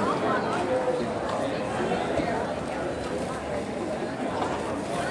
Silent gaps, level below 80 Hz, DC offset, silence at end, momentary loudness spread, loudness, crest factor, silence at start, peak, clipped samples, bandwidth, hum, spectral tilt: none; -52 dBFS; under 0.1%; 0 s; 5 LU; -28 LUFS; 14 dB; 0 s; -14 dBFS; under 0.1%; 11.5 kHz; none; -5.5 dB/octave